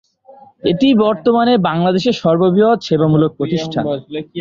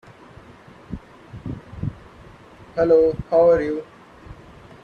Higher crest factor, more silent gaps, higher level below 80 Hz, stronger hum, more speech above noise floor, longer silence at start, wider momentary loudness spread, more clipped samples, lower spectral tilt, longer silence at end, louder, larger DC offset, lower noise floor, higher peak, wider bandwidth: second, 12 dB vs 18 dB; neither; second, -52 dBFS vs -46 dBFS; neither; about the same, 30 dB vs 29 dB; second, 0.65 s vs 0.9 s; second, 8 LU vs 21 LU; neither; about the same, -7.5 dB/octave vs -8.5 dB/octave; second, 0 s vs 0.5 s; first, -14 LUFS vs -20 LUFS; neither; about the same, -44 dBFS vs -46 dBFS; first, -2 dBFS vs -6 dBFS; first, 7.6 kHz vs 6.6 kHz